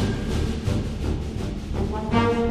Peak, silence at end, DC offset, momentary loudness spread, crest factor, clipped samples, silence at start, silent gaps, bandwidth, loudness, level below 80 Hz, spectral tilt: -6 dBFS; 0 s; 0.2%; 8 LU; 18 dB; under 0.1%; 0 s; none; 13.5 kHz; -26 LUFS; -30 dBFS; -7 dB/octave